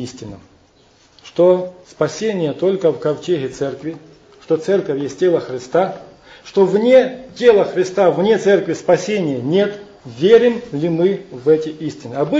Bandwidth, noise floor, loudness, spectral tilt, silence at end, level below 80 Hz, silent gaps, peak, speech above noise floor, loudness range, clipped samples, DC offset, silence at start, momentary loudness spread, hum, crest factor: 8 kHz; -52 dBFS; -16 LUFS; -6 dB/octave; 0 s; -58 dBFS; none; 0 dBFS; 36 dB; 5 LU; under 0.1%; under 0.1%; 0 s; 15 LU; none; 16 dB